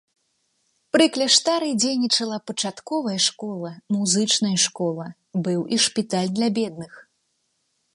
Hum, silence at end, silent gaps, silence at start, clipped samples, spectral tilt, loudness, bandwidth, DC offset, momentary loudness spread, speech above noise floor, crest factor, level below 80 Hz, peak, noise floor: none; 0.95 s; none; 0.95 s; under 0.1%; -3 dB/octave; -21 LUFS; 11.5 kHz; under 0.1%; 13 LU; 49 dB; 20 dB; -72 dBFS; -4 dBFS; -72 dBFS